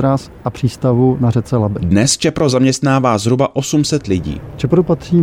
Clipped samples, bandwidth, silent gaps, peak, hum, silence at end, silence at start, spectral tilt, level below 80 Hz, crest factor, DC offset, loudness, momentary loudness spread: under 0.1%; 15 kHz; none; -2 dBFS; none; 0 s; 0 s; -5.5 dB/octave; -40 dBFS; 12 dB; under 0.1%; -15 LUFS; 7 LU